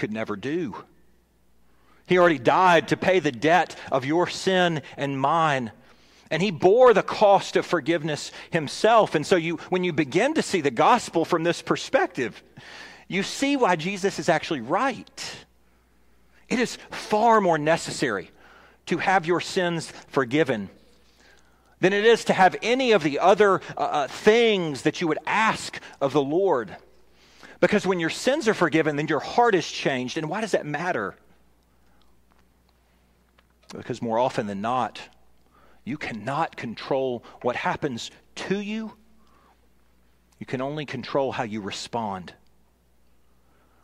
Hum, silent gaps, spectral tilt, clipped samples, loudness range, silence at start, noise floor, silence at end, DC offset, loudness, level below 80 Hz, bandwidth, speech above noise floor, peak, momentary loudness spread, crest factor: none; none; -5 dB/octave; under 0.1%; 10 LU; 0 s; -63 dBFS; 1.55 s; under 0.1%; -23 LUFS; -62 dBFS; 15 kHz; 40 dB; -6 dBFS; 14 LU; 20 dB